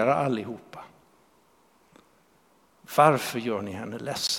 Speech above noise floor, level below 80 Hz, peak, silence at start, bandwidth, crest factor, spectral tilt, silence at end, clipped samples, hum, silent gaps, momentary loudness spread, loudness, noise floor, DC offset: 37 dB; -68 dBFS; -4 dBFS; 0 s; 17.5 kHz; 24 dB; -4.5 dB/octave; 0 s; under 0.1%; none; none; 20 LU; -26 LUFS; -63 dBFS; under 0.1%